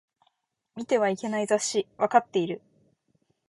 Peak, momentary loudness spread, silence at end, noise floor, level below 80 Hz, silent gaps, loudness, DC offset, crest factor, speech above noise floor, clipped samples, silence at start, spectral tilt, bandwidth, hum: -6 dBFS; 15 LU; 0.9 s; -74 dBFS; -74 dBFS; none; -26 LUFS; under 0.1%; 22 dB; 48 dB; under 0.1%; 0.75 s; -4 dB/octave; 11.5 kHz; none